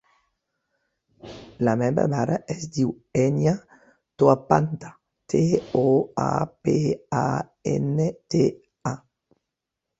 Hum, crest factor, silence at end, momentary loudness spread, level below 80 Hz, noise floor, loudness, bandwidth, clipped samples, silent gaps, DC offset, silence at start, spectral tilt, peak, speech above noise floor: none; 22 dB; 1.05 s; 12 LU; -56 dBFS; -84 dBFS; -24 LUFS; 8 kHz; under 0.1%; none; under 0.1%; 1.25 s; -7.5 dB/octave; -2 dBFS; 62 dB